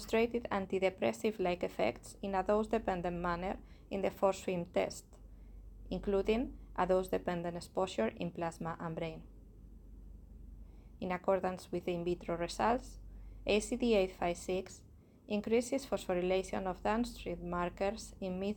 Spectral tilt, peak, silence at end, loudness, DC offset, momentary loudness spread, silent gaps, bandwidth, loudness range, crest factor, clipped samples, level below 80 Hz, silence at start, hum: -5.5 dB/octave; -16 dBFS; 0 s; -36 LUFS; under 0.1%; 19 LU; none; 17 kHz; 5 LU; 20 dB; under 0.1%; -54 dBFS; 0 s; none